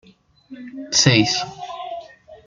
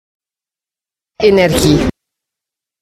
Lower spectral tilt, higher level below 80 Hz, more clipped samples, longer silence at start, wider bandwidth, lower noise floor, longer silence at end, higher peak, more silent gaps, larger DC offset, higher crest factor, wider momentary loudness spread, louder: second, -3.5 dB/octave vs -5 dB/octave; second, -54 dBFS vs -32 dBFS; neither; second, 0.5 s vs 1.2 s; second, 11 kHz vs 16 kHz; second, -39 dBFS vs -89 dBFS; second, 0.1 s vs 0.9 s; about the same, 0 dBFS vs 0 dBFS; neither; neither; first, 22 dB vs 16 dB; first, 22 LU vs 5 LU; second, -16 LUFS vs -12 LUFS